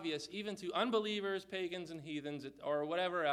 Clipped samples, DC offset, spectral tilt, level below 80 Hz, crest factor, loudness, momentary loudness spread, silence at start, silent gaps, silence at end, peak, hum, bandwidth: under 0.1%; under 0.1%; -4.5 dB/octave; -78 dBFS; 18 dB; -39 LUFS; 9 LU; 0 s; none; 0 s; -22 dBFS; none; 14 kHz